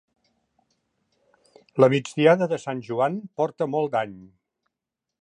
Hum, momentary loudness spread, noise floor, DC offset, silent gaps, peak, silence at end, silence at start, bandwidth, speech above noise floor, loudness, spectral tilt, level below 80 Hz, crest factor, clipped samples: none; 10 LU; -86 dBFS; under 0.1%; none; -4 dBFS; 0.95 s; 1.75 s; 10 kHz; 63 dB; -23 LUFS; -6.5 dB/octave; -72 dBFS; 22 dB; under 0.1%